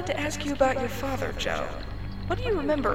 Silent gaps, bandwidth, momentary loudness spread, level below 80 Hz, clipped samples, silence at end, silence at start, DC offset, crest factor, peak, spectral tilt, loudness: none; 17 kHz; 11 LU; -38 dBFS; under 0.1%; 0 s; 0 s; 1%; 18 dB; -8 dBFS; -5 dB/octave; -29 LUFS